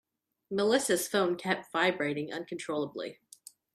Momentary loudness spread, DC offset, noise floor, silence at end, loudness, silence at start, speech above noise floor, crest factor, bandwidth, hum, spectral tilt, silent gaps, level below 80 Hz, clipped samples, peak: 11 LU; under 0.1%; -56 dBFS; 0.6 s; -30 LUFS; 0.5 s; 25 dB; 20 dB; 15.5 kHz; none; -3.5 dB/octave; none; -76 dBFS; under 0.1%; -12 dBFS